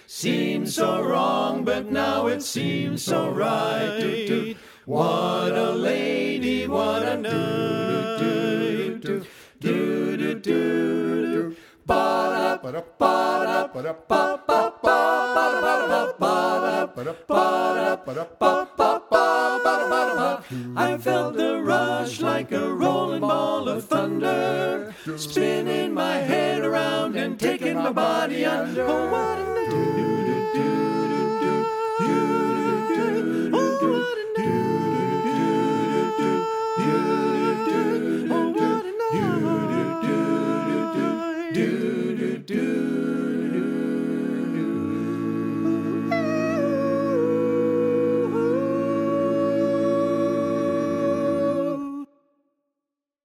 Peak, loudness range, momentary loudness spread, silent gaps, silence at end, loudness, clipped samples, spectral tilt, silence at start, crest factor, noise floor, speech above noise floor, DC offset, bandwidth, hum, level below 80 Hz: -4 dBFS; 3 LU; 5 LU; none; 1.2 s; -23 LUFS; under 0.1%; -5.5 dB/octave; 0.1 s; 20 dB; -86 dBFS; 63 dB; under 0.1%; 16.5 kHz; none; -62 dBFS